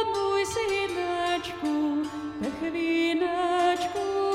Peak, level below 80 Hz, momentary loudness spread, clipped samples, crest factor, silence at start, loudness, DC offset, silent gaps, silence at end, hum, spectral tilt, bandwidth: -12 dBFS; -58 dBFS; 6 LU; under 0.1%; 14 dB; 0 s; -27 LUFS; under 0.1%; none; 0 s; none; -4 dB/octave; 15 kHz